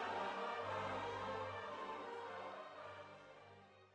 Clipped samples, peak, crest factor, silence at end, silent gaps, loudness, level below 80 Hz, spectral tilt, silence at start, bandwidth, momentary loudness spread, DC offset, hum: under 0.1%; -32 dBFS; 14 dB; 0 s; none; -47 LUFS; -78 dBFS; -4.5 dB/octave; 0 s; 10 kHz; 16 LU; under 0.1%; none